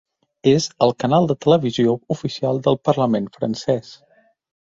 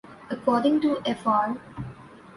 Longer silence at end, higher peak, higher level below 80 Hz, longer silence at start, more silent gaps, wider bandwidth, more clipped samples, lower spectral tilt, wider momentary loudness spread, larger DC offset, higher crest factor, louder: first, 0.8 s vs 0 s; first, -2 dBFS vs -10 dBFS; about the same, -58 dBFS vs -58 dBFS; first, 0.45 s vs 0.05 s; neither; second, 7.8 kHz vs 11.5 kHz; neither; about the same, -6.5 dB/octave vs -6.5 dB/octave; second, 7 LU vs 17 LU; neither; about the same, 18 dB vs 16 dB; first, -19 LUFS vs -25 LUFS